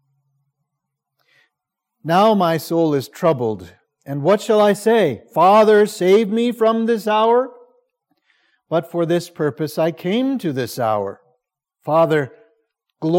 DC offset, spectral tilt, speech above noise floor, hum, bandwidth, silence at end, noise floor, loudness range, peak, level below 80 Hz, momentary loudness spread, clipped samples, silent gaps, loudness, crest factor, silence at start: under 0.1%; -6 dB/octave; 64 dB; none; 17 kHz; 0 s; -80 dBFS; 6 LU; -4 dBFS; -70 dBFS; 10 LU; under 0.1%; none; -17 LUFS; 16 dB; 2.05 s